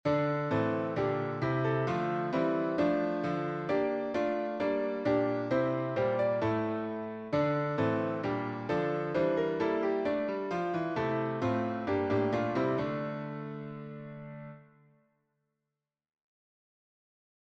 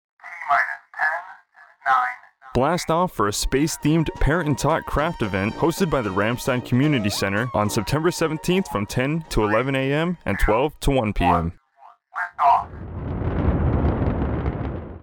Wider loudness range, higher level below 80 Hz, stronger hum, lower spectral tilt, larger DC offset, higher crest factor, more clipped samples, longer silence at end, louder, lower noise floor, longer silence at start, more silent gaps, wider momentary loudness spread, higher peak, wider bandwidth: first, 7 LU vs 1 LU; second, -66 dBFS vs -32 dBFS; neither; first, -8 dB/octave vs -5.5 dB/octave; neither; about the same, 14 dB vs 16 dB; neither; first, 2.95 s vs 0.05 s; second, -31 LUFS vs -22 LUFS; first, -89 dBFS vs -51 dBFS; second, 0.05 s vs 0.25 s; neither; about the same, 9 LU vs 8 LU; second, -18 dBFS vs -6 dBFS; second, 7.8 kHz vs over 20 kHz